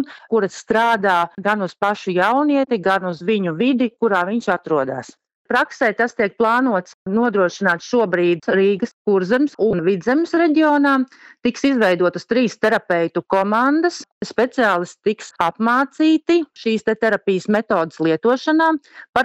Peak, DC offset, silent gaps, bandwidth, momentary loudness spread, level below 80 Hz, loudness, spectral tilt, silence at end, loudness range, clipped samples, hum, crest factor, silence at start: 0 dBFS; under 0.1%; 5.35-5.45 s, 6.94-7.06 s, 8.93-9.05 s, 14.12-14.21 s, 19.09-19.13 s; 12 kHz; 5 LU; -60 dBFS; -18 LUFS; -5.5 dB/octave; 0 s; 2 LU; under 0.1%; none; 18 dB; 0 s